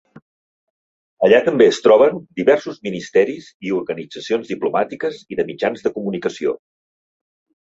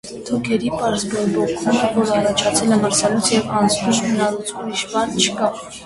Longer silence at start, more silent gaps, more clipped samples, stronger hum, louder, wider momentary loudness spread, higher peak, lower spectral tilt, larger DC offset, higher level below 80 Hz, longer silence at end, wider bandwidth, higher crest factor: first, 1.2 s vs 0.05 s; first, 3.54-3.60 s vs none; neither; neither; about the same, -18 LUFS vs -18 LUFS; first, 14 LU vs 6 LU; about the same, -2 dBFS vs -2 dBFS; first, -5.5 dB/octave vs -3.5 dB/octave; neither; second, -62 dBFS vs -50 dBFS; first, 1.1 s vs 0 s; second, 7.8 kHz vs 12 kHz; about the same, 18 dB vs 18 dB